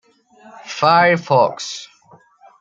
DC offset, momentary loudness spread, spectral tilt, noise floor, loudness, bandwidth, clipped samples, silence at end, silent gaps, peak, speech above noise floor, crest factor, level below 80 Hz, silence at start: under 0.1%; 17 LU; -4.5 dB/octave; -50 dBFS; -15 LUFS; 8.8 kHz; under 0.1%; 0.75 s; none; 0 dBFS; 35 dB; 18 dB; -68 dBFS; 0.65 s